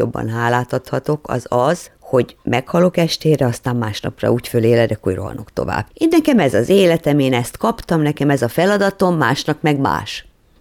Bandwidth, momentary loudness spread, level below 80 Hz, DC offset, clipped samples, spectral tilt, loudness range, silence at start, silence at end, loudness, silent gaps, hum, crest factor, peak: 19 kHz; 8 LU; -44 dBFS; under 0.1%; under 0.1%; -6 dB/octave; 3 LU; 0 s; 0.4 s; -17 LUFS; none; none; 14 dB; -2 dBFS